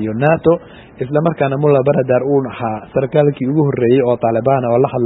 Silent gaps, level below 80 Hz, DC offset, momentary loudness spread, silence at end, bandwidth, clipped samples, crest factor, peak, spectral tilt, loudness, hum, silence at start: none; -48 dBFS; under 0.1%; 6 LU; 0 s; 4 kHz; under 0.1%; 14 dB; 0 dBFS; -12 dB/octave; -15 LUFS; none; 0 s